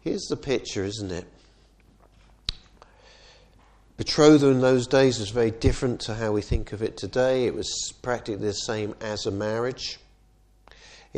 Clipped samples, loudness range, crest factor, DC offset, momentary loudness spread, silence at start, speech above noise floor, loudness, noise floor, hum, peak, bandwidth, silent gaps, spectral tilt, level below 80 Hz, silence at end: under 0.1%; 12 LU; 22 dB; under 0.1%; 15 LU; 0.05 s; 35 dB; -25 LUFS; -58 dBFS; none; -4 dBFS; 10 kHz; none; -5 dB/octave; -40 dBFS; 0 s